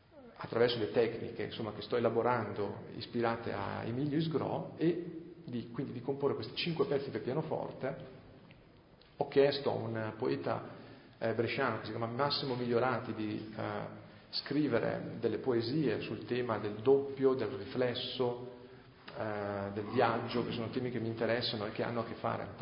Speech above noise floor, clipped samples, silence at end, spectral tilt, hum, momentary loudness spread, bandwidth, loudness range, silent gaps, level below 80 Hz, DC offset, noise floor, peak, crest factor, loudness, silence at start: 26 dB; under 0.1%; 0 s; -4.5 dB/octave; none; 11 LU; 5.2 kHz; 3 LU; none; -66 dBFS; under 0.1%; -60 dBFS; -16 dBFS; 20 dB; -35 LUFS; 0.15 s